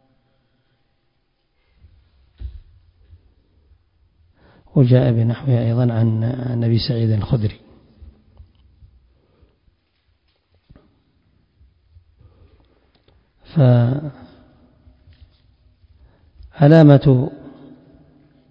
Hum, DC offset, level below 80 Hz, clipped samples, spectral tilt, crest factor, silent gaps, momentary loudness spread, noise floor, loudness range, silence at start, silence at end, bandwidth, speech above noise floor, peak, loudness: none; under 0.1%; -46 dBFS; under 0.1%; -10.5 dB/octave; 20 dB; none; 25 LU; -67 dBFS; 8 LU; 2.4 s; 1 s; 5.4 kHz; 52 dB; 0 dBFS; -16 LUFS